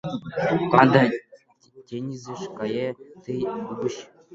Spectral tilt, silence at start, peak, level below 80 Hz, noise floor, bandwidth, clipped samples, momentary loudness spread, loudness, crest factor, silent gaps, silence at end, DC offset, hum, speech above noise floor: -7 dB/octave; 0.05 s; 0 dBFS; -62 dBFS; -54 dBFS; 7.8 kHz; under 0.1%; 18 LU; -24 LUFS; 24 dB; none; 0.3 s; under 0.1%; none; 31 dB